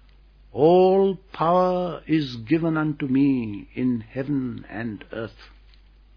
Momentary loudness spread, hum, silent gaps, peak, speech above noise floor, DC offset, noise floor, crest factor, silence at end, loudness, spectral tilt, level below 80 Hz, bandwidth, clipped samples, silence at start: 15 LU; none; none; -4 dBFS; 29 dB; under 0.1%; -51 dBFS; 18 dB; 0.7 s; -23 LUFS; -9 dB/octave; -52 dBFS; 5.4 kHz; under 0.1%; 0.55 s